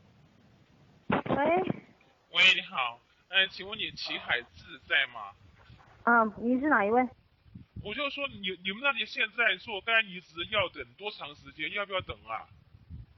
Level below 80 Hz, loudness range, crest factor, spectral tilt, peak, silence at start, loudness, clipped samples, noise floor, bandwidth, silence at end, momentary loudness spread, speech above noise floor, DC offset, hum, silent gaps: -62 dBFS; 4 LU; 20 dB; -4.5 dB/octave; -10 dBFS; 1.1 s; -29 LUFS; under 0.1%; -61 dBFS; 7.8 kHz; 0.15 s; 15 LU; 31 dB; under 0.1%; none; none